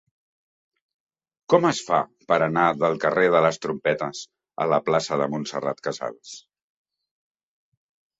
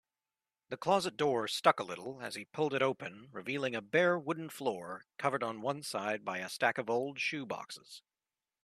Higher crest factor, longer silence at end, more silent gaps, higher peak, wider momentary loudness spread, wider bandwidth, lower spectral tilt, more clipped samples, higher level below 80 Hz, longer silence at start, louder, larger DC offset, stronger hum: about the same, 22 dB vs 26 dB; first, 1.8 s vs 0.65 s; neither; first, -4 dBFS vs -10 dBFS; about the same, 14 LU vs 14 LU; second, 8 kHz vs 14 kHz; about the same, -5 dB/octave vs -4 dB/octave; neither; first, -66 dBFS vs -82 dBFS; first, 1.5 s vs 0.7 s; first, -23 LUFS vs -34 LUFS; neither; neither